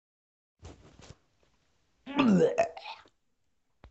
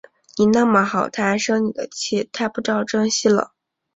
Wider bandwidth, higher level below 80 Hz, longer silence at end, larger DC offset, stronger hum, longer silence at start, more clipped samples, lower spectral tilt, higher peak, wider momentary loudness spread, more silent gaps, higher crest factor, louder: about the same, 8.2 kHz vs 8 kHz; about the same, -62 dBFS vs -60 dBFS; first, 0.95 s vs 0.5 s; neither; neither; first, 0.65 s vs 0.35 s; neither; first, -7 dB/octave vs -4 dB/octave; second, -12 dBFS vs -2 dBFS; first, 21 LU vs 8 LU; neither; about the same, 22 dB vs 18 dB; second, -27 LUFS vs -19 LUFS